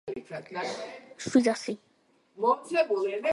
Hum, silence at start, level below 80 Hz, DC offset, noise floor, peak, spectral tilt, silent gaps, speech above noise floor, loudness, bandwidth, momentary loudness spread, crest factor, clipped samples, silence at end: none; 0.05 s; -72 dBFS; under 0.1%; -67 dBFS; -10 dBFS; -4.5 dB/octave; none; 38 dB; -29 LUFS; 11.5 kHz; 14 LU; 20 dB; under 0.1%; 0 s